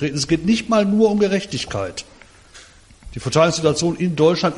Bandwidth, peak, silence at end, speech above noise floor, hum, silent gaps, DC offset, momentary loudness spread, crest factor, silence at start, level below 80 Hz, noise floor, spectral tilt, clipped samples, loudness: 11.5 kHz; -4 dBFS; 0 s; 27 dB; none; none; under 0.1%; 12 LU; 16 dB; 0 s; -46 dBFS; -45 dBFS; -5 dB/octave; under 0.1%; -18 LUFS